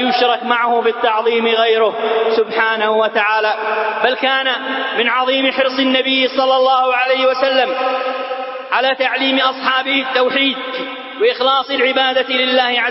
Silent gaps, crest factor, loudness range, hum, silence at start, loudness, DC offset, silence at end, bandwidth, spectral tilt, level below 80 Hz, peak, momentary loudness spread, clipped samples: none; 16 dB; 2 LU; none; 0 s; -15 LUFS; under 0.1%; 0 s; 5.8 kHz; -6 dB/octave; -68 dBFS; 0 dBFS; 5 LU; under 0.1%